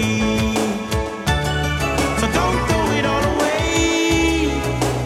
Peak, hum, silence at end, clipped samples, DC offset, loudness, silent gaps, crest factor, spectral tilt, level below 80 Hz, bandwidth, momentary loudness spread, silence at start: -4 dBFS; none; 0 s; under 0.1%; under 0.1%; -19 LUFS; none; 14 dB; -4.5 dB/octave; -28 dBFS; 16 kHz; 4 LU; 0 s